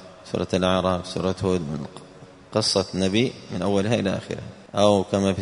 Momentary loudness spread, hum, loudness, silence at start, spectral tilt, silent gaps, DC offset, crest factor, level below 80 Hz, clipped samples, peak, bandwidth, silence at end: 12 LU; none; -23 LUFS; 0 s; -5.5 dB/octave; none; under 0.1%; 20 dB; -54 dBFS; under 0.1%; -4 dBFS; 11 kHz; 0 s